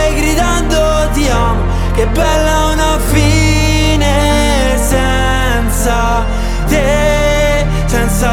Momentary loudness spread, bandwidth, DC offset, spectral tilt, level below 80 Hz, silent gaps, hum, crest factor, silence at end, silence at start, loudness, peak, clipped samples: 3 LU; 16.5 kHz; under 0.1%; -4.5 dB/octave; -14 dBFS; none; none; 10 dB; 0 s; 0 s; -12 LUFS; 0 dBFS; under 0.1%